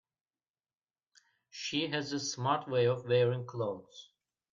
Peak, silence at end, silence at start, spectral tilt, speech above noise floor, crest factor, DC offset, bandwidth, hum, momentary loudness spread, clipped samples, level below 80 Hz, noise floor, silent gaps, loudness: -14 dBFS; 0.5 s; 1.55 s; -5 dB/octave; over 58 dB; 20 dB; under 0.1%; 7.6 kHz; none; 18 LU; under 0.1%; -80 dBFS; under -90 dBFS; none; -33 LUFS